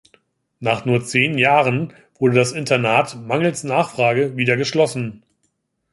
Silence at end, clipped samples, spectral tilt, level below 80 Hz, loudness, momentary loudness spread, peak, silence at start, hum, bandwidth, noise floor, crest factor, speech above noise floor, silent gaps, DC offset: 0.75 s; under 0.1%; -5 dB/octave; -60 dBFS; -18 LUFS; 8 LU; -2 dBFS; 0.6 s; none; 11.5 kHz; -70 dBFS; 18 dB; 52 dB; none; under 0.1%